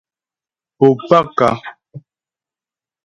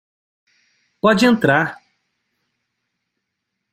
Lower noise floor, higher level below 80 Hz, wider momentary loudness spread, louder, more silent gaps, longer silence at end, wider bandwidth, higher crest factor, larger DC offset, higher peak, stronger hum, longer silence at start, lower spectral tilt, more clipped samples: first, under -90 dBFS vs -78 dBFS; about the same, -56 dBFS vs -58 dBFS; first, 14 LU vs 6 LU; about the same, -14 LUFS vs -16 LUFS; neither; second, 1.05 s vs 2 s; second, 9.2 kHz vs 15.5 kHz; about the same, 18 dB vs 20 dB; neither; about the same, 0 dBFS vs -2 dBFS; neither; second, 0.8 s vs 1.05 s; first, -7.5 dB/octave vs -5.5 dB/octave; neither